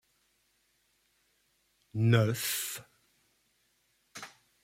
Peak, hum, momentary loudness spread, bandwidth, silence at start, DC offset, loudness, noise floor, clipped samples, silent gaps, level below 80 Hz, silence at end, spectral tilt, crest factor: -12 dBFS; none; 22 LU; 16.5 kHz; 1.95 s; under 0.1%; -30 LUFS; -73 dBFS; under 0.1%; none; -72 dBFS; 0.35 s; -5 dB/octave; 24 dB